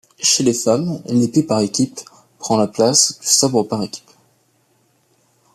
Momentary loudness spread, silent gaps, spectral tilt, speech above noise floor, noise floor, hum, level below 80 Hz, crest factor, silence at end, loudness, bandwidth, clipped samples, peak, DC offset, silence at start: 12 LU; none; -3.5 dB/octave; 44 dB; -60 dBFS; none; -60 dBFS; 18 dB; 1.55 s; -16 LUFS; 14.5 kHz; under 0.1%; 0 dBFS; under 0.1%; 0.2 s